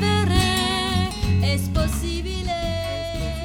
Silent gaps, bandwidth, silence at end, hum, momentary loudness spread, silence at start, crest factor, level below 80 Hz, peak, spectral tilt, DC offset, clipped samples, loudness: none; 17.5 kHz; 0 s; none; 8 LU; 0 s; 16 dB; -30 dBFS; -6 dBFS; -5 dB/octave; under 0.1%; under 0.1%; -23 LUFS